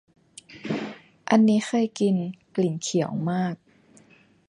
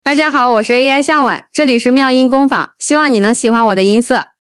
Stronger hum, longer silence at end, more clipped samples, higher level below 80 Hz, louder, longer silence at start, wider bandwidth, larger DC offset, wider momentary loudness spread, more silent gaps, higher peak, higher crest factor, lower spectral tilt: neither; first, 0.95 s vs 0.15 s; neither; second, -70 dBFS vs -54 dBFS; second, -25 LUFS vs -11 LUFS; first, 0.5 s vs 0.05 s; second, 10.5 kHz vs 12 kHz; neither; first, 19 LU vs 4 LU; neither; second, -6 dBFS vs 0 dBFS; first, 20 dB vs 10 dB; first, -6 dB/octave vs -4 dB/octave